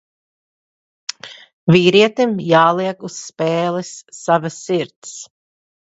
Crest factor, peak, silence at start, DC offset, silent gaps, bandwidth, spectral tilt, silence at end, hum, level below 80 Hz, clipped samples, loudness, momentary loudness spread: 18 dB; 0 dBFS; 1.25 s; under 0.1%; 1.53-1.67 s, 4.96-5.02 s; 8.2 kHz; -5 dB/octave; 0.75 s; none; -62 dBFS; under 0.1%; -16 LUFS; 20 LU